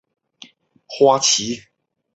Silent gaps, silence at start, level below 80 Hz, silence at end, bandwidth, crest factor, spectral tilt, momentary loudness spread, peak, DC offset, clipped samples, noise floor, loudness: none; 0.9 s; -64 dBFS; 0.55 s; 8.2 kHz; 20 dB; -2 dB/octave; 18 LU; -2 dBFS; under 0.1%; under 0.1%; -47 dBFS; -16 LUFS